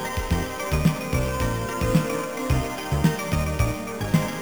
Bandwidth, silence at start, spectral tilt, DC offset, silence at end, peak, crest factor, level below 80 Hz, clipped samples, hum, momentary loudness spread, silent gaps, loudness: over 20 kHz; 0 s; -6 dB/octave; 0.4%; 0 s; -6 dBFS; 18 dB; -32 dBFS; under 0.1%; none; 4 LU; none; -25 LUFS